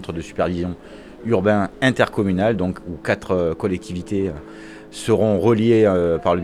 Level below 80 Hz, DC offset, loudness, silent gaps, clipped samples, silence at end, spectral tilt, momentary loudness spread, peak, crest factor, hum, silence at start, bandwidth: -48 dBFS; under 0.1%; -20 LUFS; none; under 0.1%; 0 s; -7 dB/octave; 17 LU; -2 dBFS; 18 dB; none; 0 s; 13 kHz